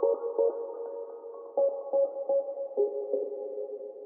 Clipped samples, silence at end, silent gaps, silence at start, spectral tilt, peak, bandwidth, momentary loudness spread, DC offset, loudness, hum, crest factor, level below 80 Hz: under 0.1%; 0 s; none; 0 s; -2 dB/octave; -14 dBFS; 1.6 kHz; 11 LU; under 0.1%; -31 LUFS; none; 16 dB; under -90 dBFS